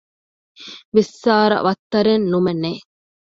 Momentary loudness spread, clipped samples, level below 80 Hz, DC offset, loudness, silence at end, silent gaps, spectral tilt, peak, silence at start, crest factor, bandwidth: 20 LU; under 0.1%; -58 dBFS; under 0.1%; -18 LUFS; 0.55 s; 0.85-0.92 s, 1.79-1.90 s; -6.5 dB/octave; -2 dBFS; 0.6 s; 18 dB; 7.8 kHz